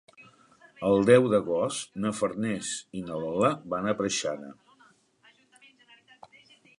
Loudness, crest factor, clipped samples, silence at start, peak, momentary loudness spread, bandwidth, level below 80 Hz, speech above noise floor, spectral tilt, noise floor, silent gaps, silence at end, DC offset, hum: -27 LUFS; 24 dB; under 0.1%; 0.2 s; -6 dBFS; 14 LU; 11.5 kHz; -64 dBFS; 36 dB; -5 dB/octave; -62 dBFS; none; 2.25 s; under 0.1%; none